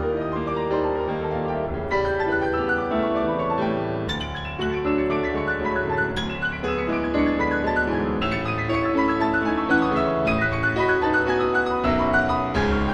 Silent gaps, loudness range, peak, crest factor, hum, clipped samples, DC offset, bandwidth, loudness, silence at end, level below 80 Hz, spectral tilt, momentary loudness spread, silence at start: none; 3 LU; -8 dBFS; 16 dB; none; under 0.1%; under 0.1%; 11 kHz; -23 LUFS; 0 s; -38 dBFS; -7 dB/octave; 5 LU; 0 s